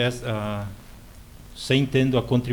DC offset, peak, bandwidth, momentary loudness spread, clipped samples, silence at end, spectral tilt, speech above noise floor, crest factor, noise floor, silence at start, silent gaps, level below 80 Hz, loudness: under 0.1%; -8 dBFS; 19.5 kHz; 19 LU; under 0.1%; 0 s; -6 dB/octave; 21 dB; 16 dB; -44 dBFS; 0 s; none; -46 dBFS; -24 LUFS